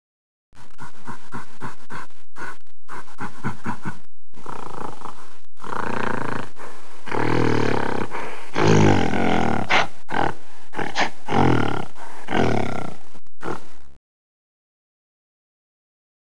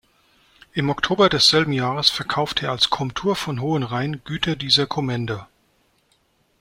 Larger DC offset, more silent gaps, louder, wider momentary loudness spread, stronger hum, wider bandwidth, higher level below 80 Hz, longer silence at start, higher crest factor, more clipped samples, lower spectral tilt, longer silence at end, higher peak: first, 10% vs under 0.1%; neither; second, -23 LUFS vs -20 LUFS; first, 21 LU vs 11 LU; neither; second, 11 kHz vs 16 kHz; about the same, -48 dBFS vs -50 dBFS; second, 0.5 s vs 0.75 s; about the same, 22 dB vs 22 dB; neither; first, -6 dB/octave vs -4 dB/octave; first, 2.3 s vs 1.15 s; about the same, -2 dBFS vs -2 dBFS